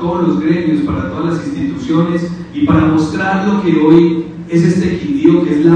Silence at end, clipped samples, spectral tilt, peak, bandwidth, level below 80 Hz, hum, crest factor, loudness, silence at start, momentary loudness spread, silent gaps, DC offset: 0 s; 0.1%; -8 dB/octave; 0 dBFS; 8.8 kHz; -38 dBFS; none; 12 dB; -13 LUFS; 0 s; 9 LU; none; under 0.1%